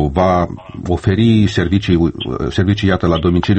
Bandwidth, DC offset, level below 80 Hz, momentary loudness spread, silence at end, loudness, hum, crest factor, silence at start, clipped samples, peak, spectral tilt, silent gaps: 8.6 kHz; under 0.1%; -30 dBFS; 9 LU; 0 s; -15 LUFS; none; 14 dB; 0 s; under 0.1%; 0 dBFS; -7.5 dB/octave; none